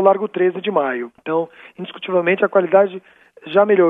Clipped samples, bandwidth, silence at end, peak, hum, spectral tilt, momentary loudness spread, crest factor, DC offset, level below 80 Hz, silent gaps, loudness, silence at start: under 0.1%; 3.9 kHz; 0 s; 0 dBFS; none; -9 dB/octave; 16 LU; 16 dB; under 0.1%; -72 dBFS; none; -18 LUFS; 0 s